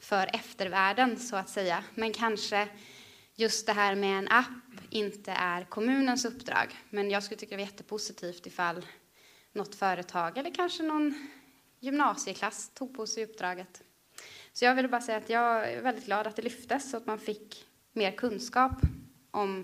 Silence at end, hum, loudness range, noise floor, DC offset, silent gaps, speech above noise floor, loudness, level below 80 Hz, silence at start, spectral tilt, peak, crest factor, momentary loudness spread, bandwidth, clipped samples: 0 s; none; 5 LU; -61 dBFS; under 0.1%; none; 30 dB; -31 LUFS; -52 dBFS; 0 s; -3.5 dB/octave; -8 dBFS; 24 dB; 15 LU; 15.5 kHz; under 0.1%